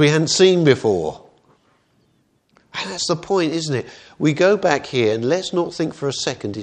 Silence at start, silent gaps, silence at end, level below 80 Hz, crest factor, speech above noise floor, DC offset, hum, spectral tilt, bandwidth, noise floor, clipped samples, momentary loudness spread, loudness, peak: 0 s; none; 0 s; -58 dBFS; 20 dB; 44 dB; under 0.1%; none; -4.5 dB/octave; 9.8 kHz; -62 dBFS; under 0.1%; 12 LU; -19 LUFS; 0 dBFS